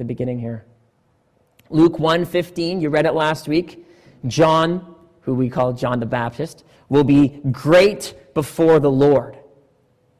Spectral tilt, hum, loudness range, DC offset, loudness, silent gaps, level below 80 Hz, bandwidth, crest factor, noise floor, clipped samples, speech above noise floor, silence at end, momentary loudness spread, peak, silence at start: -6.5 dB/octave; none; 4 LU; under 0.1%; -18 LUFS; none; -50 dBFS; 15 kHz; 14 dB; -62 dBFS; under 0.1%; 44 dB; 0.85 s; 16 LU; -4 dBFS; 0 s